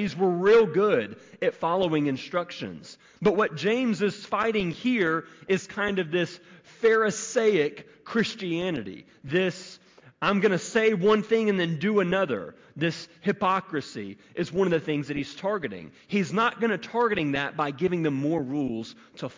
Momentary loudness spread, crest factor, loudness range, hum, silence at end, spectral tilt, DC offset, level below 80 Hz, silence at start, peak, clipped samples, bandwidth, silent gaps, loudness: 13 LU; 14 dB; 3 LU; none; 0.05 s; -5.5 dB/octave; under 0.1%; -62 dBFS; 0 s; -12 dBFS; under 0.1%; 7.6 kHz; none; -26 LUFS